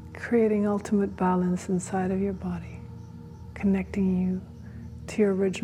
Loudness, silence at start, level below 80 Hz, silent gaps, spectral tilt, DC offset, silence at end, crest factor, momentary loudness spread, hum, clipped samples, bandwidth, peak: -27 LUFS; 0 s; -52 dBFS; none; -7.5 dB/octave; under 0.1%; 0 s; 16 dB; 18 LU; none; under 0.1%; 11 kHz; -12 dBFS